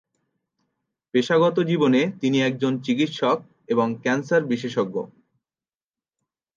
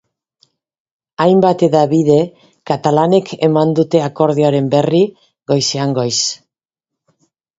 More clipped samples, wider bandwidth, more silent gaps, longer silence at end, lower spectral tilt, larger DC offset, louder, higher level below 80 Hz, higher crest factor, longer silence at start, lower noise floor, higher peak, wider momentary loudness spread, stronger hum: neither; about the same, 7.4 kHz vs 8 kHz; neither; first, 1.5 s vs 1.25 s; about the same, -6 dB/octave vs -5.5 dB/octave; neither; second, -22 LUFS vs -14 LUFS; second, -72 dBFS vs -56 dBFS; about the same, 16 dB vs 14 dB; about the same, 1.15 s vs 1.2 s; first, under -90 dBFS vs -82 dBFS; second, -8 dBFS vs 0 dBFS; about the same, 7 LU vs 8 LU; neither